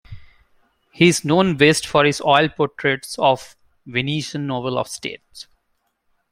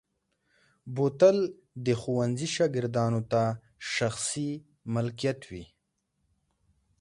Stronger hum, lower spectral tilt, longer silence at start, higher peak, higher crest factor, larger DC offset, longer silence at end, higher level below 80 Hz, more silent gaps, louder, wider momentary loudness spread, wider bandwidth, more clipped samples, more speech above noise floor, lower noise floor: neither; about the same, -4.5 dB/octave vs -5.5 dB/octave; second, 0.1 s vs 0.85 s; first, -2 dBFS vs -10 dBFS; about the same, 20 dB vs 20 dB; neither; second, 0.9 s vs 1.35 s; first, -54 dBFS vs -64 dBFS; neither; first, -18 LUFS vs -29 LUFS; about the same, 14 LU vs 16 LU; first, 16 kHz vs 11.5 kHz; neither; about the same, 51 dB vs 51 dB; second, -70 dBFS vs -78 dBFS